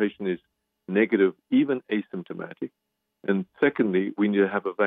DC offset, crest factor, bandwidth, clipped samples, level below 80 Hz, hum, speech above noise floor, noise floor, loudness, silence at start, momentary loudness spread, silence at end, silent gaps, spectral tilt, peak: under 0.1%; 16 dB; 4 kHz; under 0.1%; -74 dBFS; none; 57 dB; -80 dBFS; -25 LUFS; 0 s; 14 LU; 0 s; none; -10 dB/octave; -10 dBFS